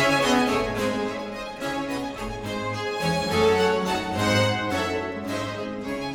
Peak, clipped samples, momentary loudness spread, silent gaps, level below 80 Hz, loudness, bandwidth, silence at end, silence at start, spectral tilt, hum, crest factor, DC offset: -8 dBFS; under 0.1%; 11 LU; none; -48 dBFS; -25 LUFS; 18 kHz; 0 s; 0 s; -4.5 dB/octave; none; 18 dB; under 0.1%